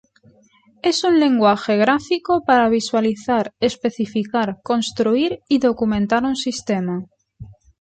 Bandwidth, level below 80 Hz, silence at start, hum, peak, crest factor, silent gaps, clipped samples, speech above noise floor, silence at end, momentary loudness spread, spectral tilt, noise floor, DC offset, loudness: 9.2 kHz; -52 dBFS; 0.85 s; none; -2 dBFS; 16 dB; none; under 0.1%; 37 dB; 0.3 s; 7 LU; -5 dB/octave; -55 dBFS; under 0.1%; -19 LUFS